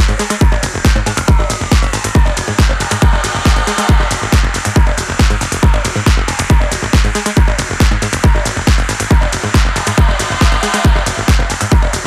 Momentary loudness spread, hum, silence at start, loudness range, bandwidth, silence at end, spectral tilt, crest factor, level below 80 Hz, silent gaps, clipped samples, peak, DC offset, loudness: 1 LU; none; 0 s; 0 LU; 14 kHz; 0 s; -4.5 dB/octave; 12 dB; -14 dBFS; none; under 0.1%; 0 dBFS; under 0.1%; -13 LUFS